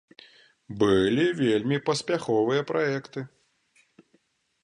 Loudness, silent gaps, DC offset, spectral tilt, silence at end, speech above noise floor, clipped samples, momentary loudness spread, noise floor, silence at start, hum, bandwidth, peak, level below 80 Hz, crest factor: -25 LUFS; none; under 0.1%; -5.5 dB/octave; 1.35 s; 44 dB; under 0.1%; 16 LU; -68 dBFS; 0.7 s; none; 11 kHz; -10 dBFS; -58 dBFS; 18 dB